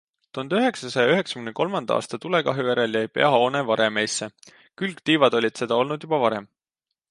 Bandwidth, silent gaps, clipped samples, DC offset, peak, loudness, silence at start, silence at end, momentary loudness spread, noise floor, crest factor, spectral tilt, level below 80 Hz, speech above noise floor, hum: 11.5 kHz; none; under 0.1%; under 0.1%; -2 dBFS; -23 LUFS; 0.35 s; 0.65 s; 11 LU; -85 dBFS; 20 dB; -4.5 dB/octave; -72 dBFS; 62 dB; none